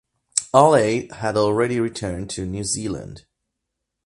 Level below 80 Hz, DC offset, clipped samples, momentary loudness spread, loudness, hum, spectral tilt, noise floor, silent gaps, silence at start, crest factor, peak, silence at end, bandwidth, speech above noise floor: -48 dBFS; under 0.1%; under 0.1%; 13 LU; -20 LUFS; none; -4.5 dB/octave; -80 dBFS; none; 0.35 s; 22 dB; 0 dBFS; 0.85 s; 11.5 kHz; 60 dB